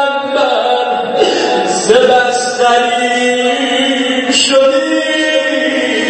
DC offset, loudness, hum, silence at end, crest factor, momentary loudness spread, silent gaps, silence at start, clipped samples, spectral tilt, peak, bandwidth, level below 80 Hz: under 0.1%; -11 LUFS; none; 0 s; 12 dB; 4 LU; none; 0 s; under 0.1%; -2 dB/octave; 0 dBFS; 8.8 kHz; -56 dBFS